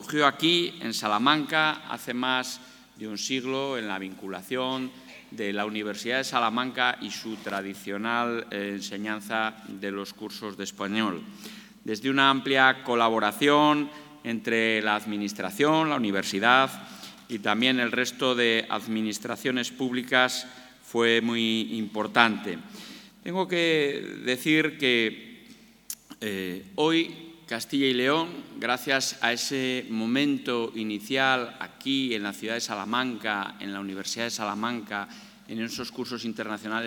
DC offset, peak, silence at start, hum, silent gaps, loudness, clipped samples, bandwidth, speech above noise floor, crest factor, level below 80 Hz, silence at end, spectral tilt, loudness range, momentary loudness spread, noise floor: under 0.1%; 0 dBFS; 0 s; none; none; -26 LUFS; under 0.1%; 19.5 kHz; 26 dB; 28 dB; -72 dBFS; 0 s; -3.5 dB/octave; 7 LU; 14 LU; -53 dBFS